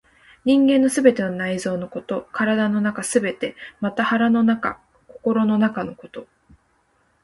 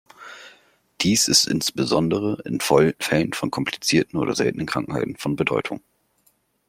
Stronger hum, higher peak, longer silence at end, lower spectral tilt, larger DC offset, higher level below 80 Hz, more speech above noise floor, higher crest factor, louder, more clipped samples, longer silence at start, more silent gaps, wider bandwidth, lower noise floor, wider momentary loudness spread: neither; about the same, -2 dBFS vs -2 dBFS; about the same, 1 s vs 0.9 s; first, -5.5 dB/octave vs -3.5 dB/octave; neither; second, -60 dBFS vs -54 dBFS; about the same, 44 dB vs 43 dB; about the same, 20 dB vs 20 dB; about the same, -21 LUFS vs -21 LUFS; neither; first, 0.45 s vs 0.2 s; neither; second, 11.5 kHz vs 16.5 kHz; about the same, -64 dBFS vs -64 dBFS; first, 13 LU vs 10 LU